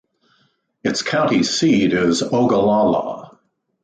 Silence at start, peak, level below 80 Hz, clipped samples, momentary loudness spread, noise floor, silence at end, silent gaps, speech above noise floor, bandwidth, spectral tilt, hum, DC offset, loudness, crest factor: 0.85 s; -6 dBFS; -54 dBFS; under 0.1%; 9 LU; -63 dBFS; 0.55 s; none; 46 dB; 9.4 kHz; -4.5 dB/octave; none; under 0.1%; -17 LUFS; 14 dB